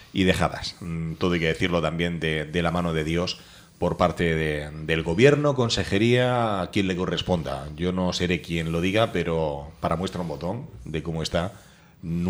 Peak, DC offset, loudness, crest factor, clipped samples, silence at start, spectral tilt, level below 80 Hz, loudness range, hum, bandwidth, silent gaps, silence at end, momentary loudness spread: -4 dBFS; under 0.1%; -25 LUFS; 22 dB; under 0.1%; 0 s; -6 dB/octave; -44 dBFS; 4 LU; none; 14 kHz; none; 0 s; 11 LU